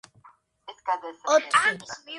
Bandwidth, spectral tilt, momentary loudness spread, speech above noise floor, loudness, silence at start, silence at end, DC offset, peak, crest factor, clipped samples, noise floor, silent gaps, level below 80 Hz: 11.5 kHz; -1.5 dB/octave; 15 LU; 32 dB; -24 LUFS; 0.7 s; 0 s; under 0.1%; -6 dBFS; 20 dB; under 0.1%; -57 dBFS; none; -72 dBFS